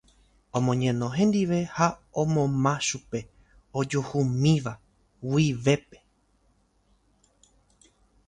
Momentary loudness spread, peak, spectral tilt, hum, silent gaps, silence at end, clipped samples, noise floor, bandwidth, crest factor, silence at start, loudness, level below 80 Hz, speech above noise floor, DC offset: 12 LU; -6 dBFS; -6 dB/octave; none; none; 2.45 s; under 0.1%; -66 dBFS; 10.5 kHz; 20 dB; 0.55 s; -26 LUFS; -56 dBFS; 41 dB; under 0.1%